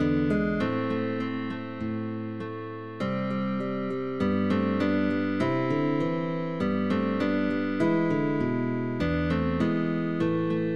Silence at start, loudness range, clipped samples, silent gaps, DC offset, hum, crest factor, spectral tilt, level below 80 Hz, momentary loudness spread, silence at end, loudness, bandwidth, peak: 0 s; 4 LU; under 0.1%; none; 0.5%; none; 14 dB; -8.5 dB/octave; -50 dBFS; 7 LU; 0 s; -28 LUFS; 8.6 kHz; -12 dBFS